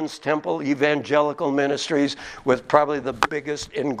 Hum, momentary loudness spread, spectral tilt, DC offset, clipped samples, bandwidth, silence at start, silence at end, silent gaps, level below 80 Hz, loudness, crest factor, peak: none; 7 LU; -4.5 dB/octave; under 0.1%; under 0.1%; 13.5 kHz; 0 s; 0 s; none; -56 dBFS; -22 LUFS; 22 dB; 0 dBFS